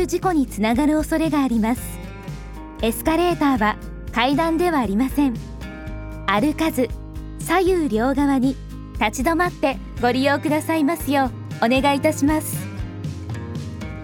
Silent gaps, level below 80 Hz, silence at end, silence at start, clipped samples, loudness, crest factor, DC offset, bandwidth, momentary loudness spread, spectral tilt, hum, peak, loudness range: none; -36 dBFS; 0 s; 0 s; under 0.1%; -21 LUFS; 18 dB; under 0.1%; 19.5 kHz; 14 LU; -5.5 dB/octave; none; -2 dBFS; 2 LU